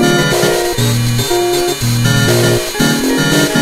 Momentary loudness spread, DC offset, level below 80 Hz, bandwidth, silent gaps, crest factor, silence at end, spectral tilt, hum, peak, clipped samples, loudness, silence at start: 3 LU; under 0.1%; -32 dBFS; 16 kHz; none; 12 dB; 0 s; -4.5 dB/octave; none; 0 dBFS; under 0.1%; -12 LUFS; 0 s